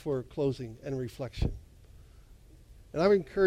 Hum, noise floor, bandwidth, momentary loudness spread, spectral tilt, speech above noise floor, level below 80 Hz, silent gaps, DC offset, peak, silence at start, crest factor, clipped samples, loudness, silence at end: none; -54 dBFS; 13 kHz; 13 LU; -7.5 dB/octave; 25 dB; -44 dBFS; none; under 0.1%; -14 dBFS; 0.05 s; 18 dB; under 0.1%; -32 LUFS; 0 s